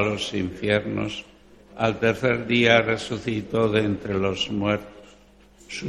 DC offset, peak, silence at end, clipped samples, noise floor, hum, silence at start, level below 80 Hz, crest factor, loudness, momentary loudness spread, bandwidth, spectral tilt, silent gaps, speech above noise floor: under 0.1%; -2 dBFS; 0 s; under 0.1%; -53 dBFS; 50 Hz at -50 dBFS; 0 s; -52 dBFS; 22 dB; -23 LUFS; 10 LU; 12.5 kHz; -5.5 dB/octave; none; 29 dB